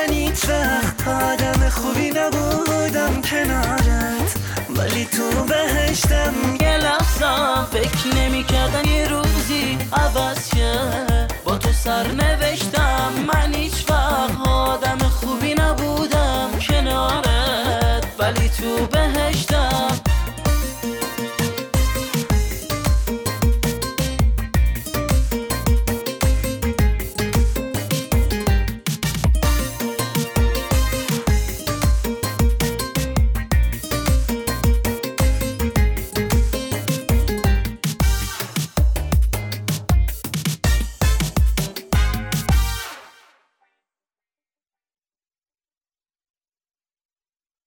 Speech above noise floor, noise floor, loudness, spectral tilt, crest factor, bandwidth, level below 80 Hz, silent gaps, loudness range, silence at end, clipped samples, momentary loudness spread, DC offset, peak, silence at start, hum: over 72 dB; under -90 dBFS; -20 LUFS; -4.5 dB/octave; 10 dB; over 20 kHz; -22 dBFS; none; 3 LU; 4.6 s; under 0.1%; 5 LU; under 0.1%; -8 dBFS; 0 s; none